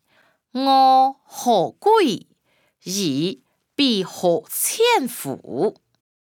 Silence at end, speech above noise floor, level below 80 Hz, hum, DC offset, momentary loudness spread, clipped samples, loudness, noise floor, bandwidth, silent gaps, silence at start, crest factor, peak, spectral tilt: 0.55 s; 45 dB; -76 dBFS; none; under 0.1%; 14 LU; under 0.1%; -19 LUFS; -64 dBFS; 20 kHz; none; 0.55 s; 14 dB; -6 dBFS; -3.5 dB/octave